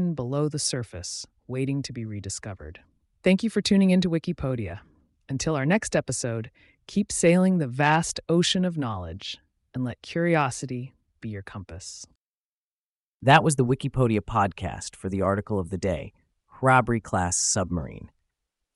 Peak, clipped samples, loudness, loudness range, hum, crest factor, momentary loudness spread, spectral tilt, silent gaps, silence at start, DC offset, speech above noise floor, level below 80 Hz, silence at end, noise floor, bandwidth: -4 dBFS; under 0.1%; -25 LUFS; 6 LU; none; 22 dB; 18 LU; -5 dB/octave; 12.15-13.20 s; 0 s; under 0.1%; over 65 dB; -50 dBFS; 0.7 s; under -90 dBFS; 11.5 kHz